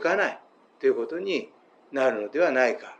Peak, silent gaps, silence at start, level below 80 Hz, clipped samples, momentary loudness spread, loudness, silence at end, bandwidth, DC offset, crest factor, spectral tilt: -10 dBFS; none; 0 s; under -90 dBFS; under 0.1%; 9 LU; -26 LUFS; 0.05 s; 8.8 kHz; under 0.1%; 16 dB; -4.5 dB/octave